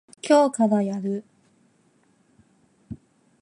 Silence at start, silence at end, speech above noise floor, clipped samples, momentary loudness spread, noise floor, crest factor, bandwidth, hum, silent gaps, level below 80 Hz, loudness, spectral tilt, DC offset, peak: 0.25 s; 0.45 s; 42 dB; under 0.1%; 24 LU; -63 dBFS; 20 dB; 11.5 kHz; none; none; -64 dBFS; -22 LUFS; -6 dB/octave; under 0.1%; -6 dBFS